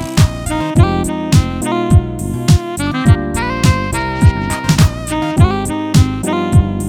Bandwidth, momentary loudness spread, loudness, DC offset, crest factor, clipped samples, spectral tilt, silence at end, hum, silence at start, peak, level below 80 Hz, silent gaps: 17 kHz; 5 LU; -14 LUFS; under 0.1%; 12 dB; under 0.1%; -6 dB/octave; 0 s; none; 0 s; 0 dBFS; -22 dBFS; none